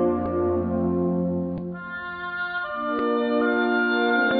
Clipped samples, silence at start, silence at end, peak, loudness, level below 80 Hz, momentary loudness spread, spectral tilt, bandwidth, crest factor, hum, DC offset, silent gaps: under 0.1%; 0 s; 0 s; -10 dBFS; -24 LUFS; -52 dBFS; 10 LU; -10 dB/octave; 4.9 kHz; 14 dB; none; under 0.1%; none